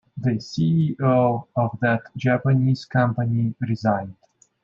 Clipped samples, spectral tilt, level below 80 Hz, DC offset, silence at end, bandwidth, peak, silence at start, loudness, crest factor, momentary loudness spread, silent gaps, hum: under 0.1%; -8.5 dB/octave; -62 dBFS; under 0.1%; 0.5 s; 7.2 kHz; -6 dBFS; 0.15 s; -22 LUFS; 16 dB; 6 LU; none; none